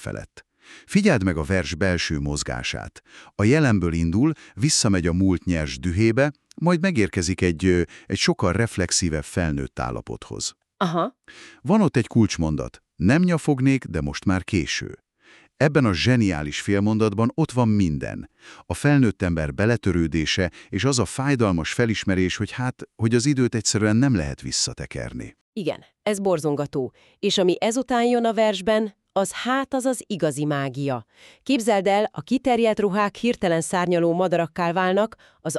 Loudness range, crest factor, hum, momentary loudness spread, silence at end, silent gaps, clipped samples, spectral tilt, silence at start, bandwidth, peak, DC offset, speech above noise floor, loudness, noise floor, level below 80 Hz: 3 LU; 18 dB; none; 10 LU; 0 s; 25.41-25.53 s; under 0.1%; -5 dB/octave; 0 s; 13 kHz; -4 dBFS; under 0.1%; 33 dB; -22 LUFS; -55 dBFS; -42 dBFS